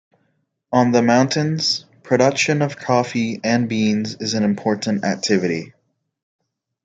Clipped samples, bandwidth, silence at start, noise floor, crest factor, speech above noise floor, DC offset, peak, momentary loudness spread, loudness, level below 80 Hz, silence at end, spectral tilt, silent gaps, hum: under 0.1%; 9.2 kHz; 0.7 s; -68 dBFS; 18 dB; 50 dB; under 0.1%; -2 dBFS; 7 LU; -19 LUFS; -62 dBFS; 1.2 s; -5 dB/octave; none; none